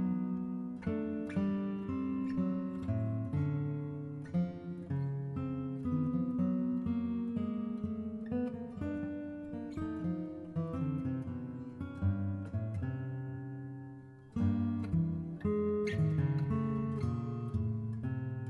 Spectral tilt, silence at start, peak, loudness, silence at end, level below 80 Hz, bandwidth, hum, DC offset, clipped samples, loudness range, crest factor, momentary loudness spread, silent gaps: -10 dB/octave; 0 s; -20 dBFS; -37 LUFS; 0 s; -58 dBFS; 7 kHz; none; under 0.1%; under 0.1%; 5 LU; 14 dB; 9 LU; none